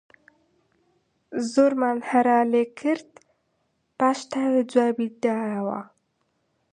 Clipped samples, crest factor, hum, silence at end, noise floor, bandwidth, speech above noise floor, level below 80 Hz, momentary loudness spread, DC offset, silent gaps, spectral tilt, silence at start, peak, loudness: under 0.1%; 20 dB; none; 0.85 s; -72 dBFS; 10 kHz; 50 dB; -76 dBFS; 10 LU; under 0.1%; none; -5.5 dB/octave; 1.3 s; -6 dBFS; -23 LUFS